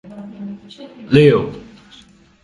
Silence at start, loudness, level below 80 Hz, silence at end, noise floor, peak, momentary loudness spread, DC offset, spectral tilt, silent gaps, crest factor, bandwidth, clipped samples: 0.15 s; -13 LUFS; -50 dBFS; 0.85 s; -47 dBFS; 0 dBFS; 25 LU; under 0.1%; -8 dB/octave; none; 18 dB; 11.5 kHz; under 0.1%